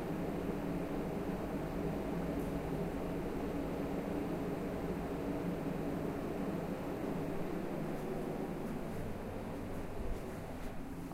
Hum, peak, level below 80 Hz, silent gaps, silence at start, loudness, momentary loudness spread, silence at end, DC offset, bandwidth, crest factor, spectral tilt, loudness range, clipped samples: none; -24 dBFS; -50 dBFS; none; 0 s; -40 LUFS; 5 LU; 0 s; under 0.1%; 16 kHz; 14 dB; -7.5 dB/octave; 2 LU; under 0.1%